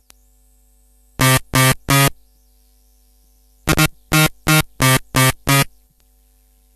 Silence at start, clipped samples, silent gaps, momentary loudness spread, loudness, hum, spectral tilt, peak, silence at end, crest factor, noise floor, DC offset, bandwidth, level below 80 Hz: 1.2 s; under 0.1%; none; 4 LU; -15 LUFS; none; -3.5 dB/octave; 0 dBFS; 1.1 s; 18 dB; -55 dBFS; under 0.1%; 14.5 kHz; -36 dBFS